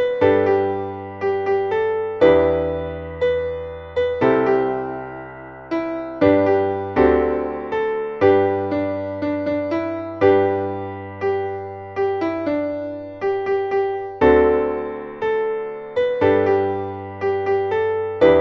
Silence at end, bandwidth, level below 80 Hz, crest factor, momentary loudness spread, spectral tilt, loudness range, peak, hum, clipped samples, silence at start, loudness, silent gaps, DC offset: 0 s; 6.2 kHz; -44 dBFS; 18 dB; 12 LU; -8.5 dB/octave; 3 LU; -2 dBFS; none; under 0.1%; 0 s; -20 LUFS; none; under 0.1%